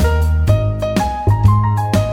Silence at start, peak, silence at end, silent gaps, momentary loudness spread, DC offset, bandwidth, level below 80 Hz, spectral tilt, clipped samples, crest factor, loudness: 0 s; 0 dBFS; 0 s; none; 5 LU; under 0.1%; 15.5 kHz; -20 dBFS; -7 dB/octave; under 0.1%; 14 dB; -15 LUFS